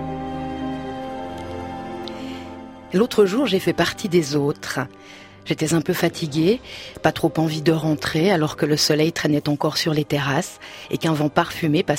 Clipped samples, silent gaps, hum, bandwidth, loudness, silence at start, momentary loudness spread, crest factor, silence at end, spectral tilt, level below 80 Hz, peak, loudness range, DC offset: under 0.1%; none; none; 16 kHz; -21 LUFS; 0 s; 14 LU; 20 dB; 0 s; -5 dB/octave; -50 dBFS; 0 dBFS; 3 LU; under 0.1%